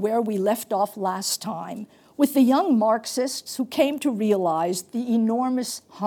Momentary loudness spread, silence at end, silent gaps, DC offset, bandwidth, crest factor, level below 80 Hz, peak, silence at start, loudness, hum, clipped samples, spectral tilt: 11 LU; 0 s; none; under 0.1%; 19.5 kHz; 16 dB; -78 dBFS; -6 dBFS; 0 s; -23 LUFS; none; under 0.1%; -4.5 dB/octave